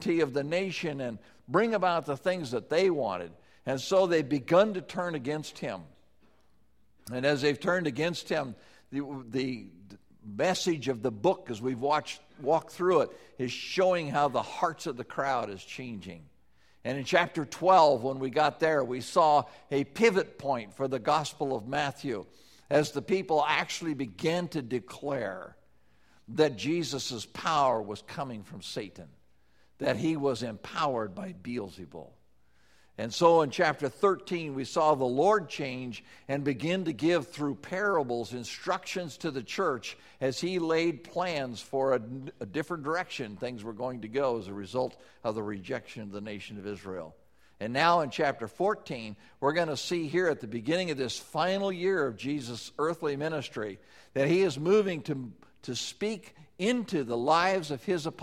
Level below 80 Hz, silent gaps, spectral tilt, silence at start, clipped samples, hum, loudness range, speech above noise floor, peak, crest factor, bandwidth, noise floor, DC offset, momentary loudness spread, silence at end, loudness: -68 dBFS; none; -5 dB/octave; 0 s; under 0.1%; none; 6 LU; 39 dB; -8 dBFS; 22 dB; 15.5 kHz; -69 dBFS; under 0.1%; 14 LU; 0 s; -30 LUFS